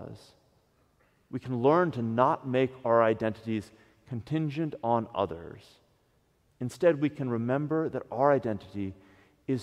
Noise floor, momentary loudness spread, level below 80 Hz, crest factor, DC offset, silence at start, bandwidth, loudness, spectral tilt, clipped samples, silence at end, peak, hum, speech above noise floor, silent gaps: -69 dBFS; 15 LU; -66 dBFS; 22 dB; under 0.1%; 0 s; 12 kHz; -29 LUFS; -8 dB/octave; under 0.1%; 0 s; -8 dBFS; none; 41 dB; none